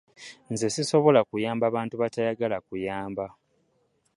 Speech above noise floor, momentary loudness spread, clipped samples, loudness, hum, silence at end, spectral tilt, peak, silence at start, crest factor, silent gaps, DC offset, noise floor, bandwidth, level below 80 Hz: 45 dB; 15 LU; under 0.1%; -26 LUFS; none; 0.9 s; -5 dB/octave; -6 dBFS; 0.2 s; 22 dB; none; under 0.1%; -70 dBFS; 11.5 kHz; -64 dBFS